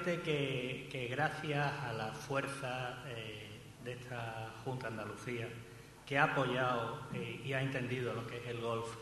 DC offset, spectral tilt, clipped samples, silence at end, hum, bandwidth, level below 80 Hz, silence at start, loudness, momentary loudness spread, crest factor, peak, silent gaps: under 0.1%; -5.5 dB/octave; under 0.1%; 0 s; none; 12 kHz; -68 dBFS; 0 s; -39 LUFS; 13 LU; 24 dB; -16 dBFS; none